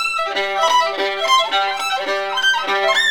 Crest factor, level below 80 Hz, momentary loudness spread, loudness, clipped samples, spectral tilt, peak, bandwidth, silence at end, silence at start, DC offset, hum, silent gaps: 14 dB; -60 dBFS; 5 LU; -17 LUFS; under 0.1%; 0.5 dB/octave; -4 dBFS; over 20 kHz; 0 s; 0 s; 0.6%; none; none